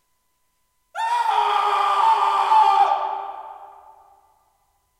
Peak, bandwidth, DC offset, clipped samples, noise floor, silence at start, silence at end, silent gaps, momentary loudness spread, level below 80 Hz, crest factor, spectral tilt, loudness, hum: -6 dBFS; 14 kHz; under 0.1%; under 0.1%; -68 dBFS; 0.95 s; 1.35 s; none; 19 LU; -74 dBFS; 16 dB; 0 dB/octave; -19 LUFS; none